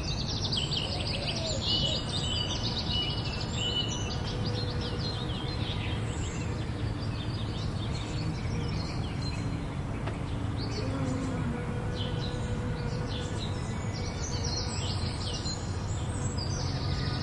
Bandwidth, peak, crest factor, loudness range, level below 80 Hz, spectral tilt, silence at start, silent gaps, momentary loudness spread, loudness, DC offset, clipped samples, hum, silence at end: 11.5 kHz; -16 dBFS; 16 dB; 4 LU; -40 dBFS; -5 dB/octave; 0 s; none; 5 LU; -32 LUFS; under 0.1%; under 0.1%; none; 0 s